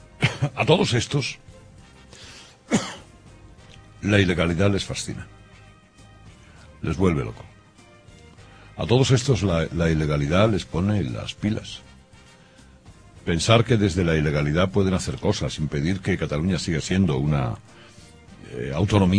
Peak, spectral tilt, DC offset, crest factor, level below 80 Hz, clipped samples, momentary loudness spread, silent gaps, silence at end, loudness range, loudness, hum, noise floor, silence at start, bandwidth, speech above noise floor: -2 dBFS; -6 dB/octave; under 0.1%; 22 dB; -42 dBFS; under 0.1%; 19 LU; none; 0 s; 6 LU; -23 LUFS; none; -51 dBFS; 0.2 s; 10.5 kHz; 29 dB